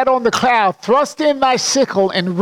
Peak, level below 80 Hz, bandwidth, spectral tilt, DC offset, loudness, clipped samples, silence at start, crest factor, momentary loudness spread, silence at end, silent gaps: -4 dBFS; -54 dBFS; 16.5 kHz; -3.5 dB/octave; under 0.1%; -15 LUFS; under 0.1%; 0 s; 12 dB; 2 LU; 0 s; none